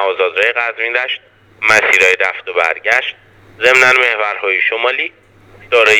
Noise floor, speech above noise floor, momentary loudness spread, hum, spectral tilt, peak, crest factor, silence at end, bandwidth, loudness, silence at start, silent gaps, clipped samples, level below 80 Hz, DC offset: -42 dBFS; 29 dB; 9 LU; none; -1 dB/octave; 0 dBFS; 14 dB; 0 s; 19.5 kHz; -12 LUFS; 0 s; none; 0.2%; -56 dBFS; under 0.1%